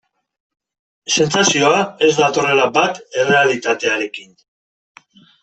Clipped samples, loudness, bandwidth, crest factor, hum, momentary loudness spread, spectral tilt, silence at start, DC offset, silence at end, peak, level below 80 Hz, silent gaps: under 0.1%; -15 LUFS; 8.4 kHz; 16 dB; none; 8 LU; -3 dB/octave; 1.1 s; under 0.1%; 1.2 s; -2 dBFS; -60 dBFS; none